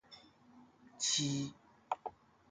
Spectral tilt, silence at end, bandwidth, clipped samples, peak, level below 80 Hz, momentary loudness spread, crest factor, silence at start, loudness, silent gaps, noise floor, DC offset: -2.5 dB/octave; 0.4 s; 9.8 kHz; under 0.1%; -20 dBFS; -76 dBFS; 22 LU; 22 dB; 0.1 s; -37 LUFS; none; -63 dBFS; under 0.1%